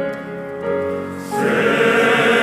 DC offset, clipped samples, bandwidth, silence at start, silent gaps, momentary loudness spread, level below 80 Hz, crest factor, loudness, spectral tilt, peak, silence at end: under 0.1%; under 0.1%; 15.5 kHz; 0 s; none; 12 LU; -60 dBFS; 14 dB; -17 LUFS; -4.5 dB/octave; -4 dBFS; 0 s